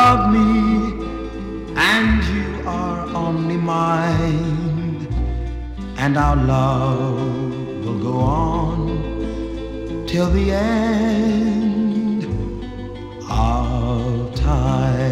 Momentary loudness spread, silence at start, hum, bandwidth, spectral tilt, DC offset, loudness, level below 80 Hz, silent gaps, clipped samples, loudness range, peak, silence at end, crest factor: 12 LU; 0 s; none; 13 kHz; -7 dB/octave; under 0.1%; -20 LUFS; -28 dBFS; none; under 0.1%; 2 LU; -4 dBFS; 0 s; 14 dB